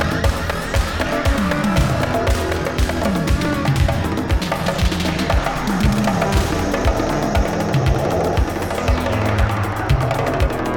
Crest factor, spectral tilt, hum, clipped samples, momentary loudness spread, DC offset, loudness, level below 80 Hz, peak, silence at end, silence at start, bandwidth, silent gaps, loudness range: 12 dB; -6 dB/octave; none; under 0.1%; 3 LU; under 0.1%; -19 LUFS; -24 dBFS; -6 dBFS; 0 s; 0 s; 19 kHz; none; 1 LU